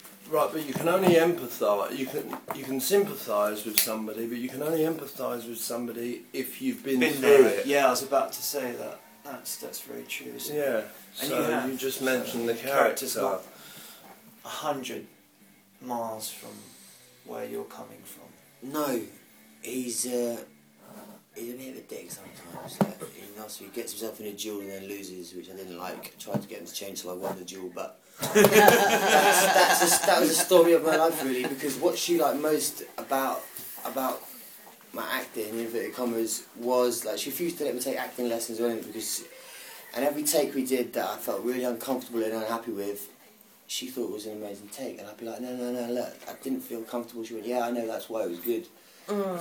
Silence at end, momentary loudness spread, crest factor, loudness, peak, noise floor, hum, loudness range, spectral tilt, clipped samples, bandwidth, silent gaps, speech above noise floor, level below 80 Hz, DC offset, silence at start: 0 s; 21 LU; 28 dB; -27 LUFS; 0 dBFS; -58 dBFS; none; 15 LU; -3 dB/octave; under 0.1%; 19.5 kHz; none; 31 dB; -74 dBFS; under 0.1%; 0.05 s